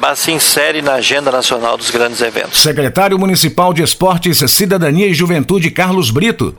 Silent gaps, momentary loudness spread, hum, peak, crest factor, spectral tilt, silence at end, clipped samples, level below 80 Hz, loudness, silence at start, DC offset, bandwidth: none; 4 LU; none; 0 dBFS; 12 dB; -3.5 dB/octave; 0.05 s; under 0.1%; -40 dBFS; -11 LUFS; 0 s; under 0.1%; over 20 kHz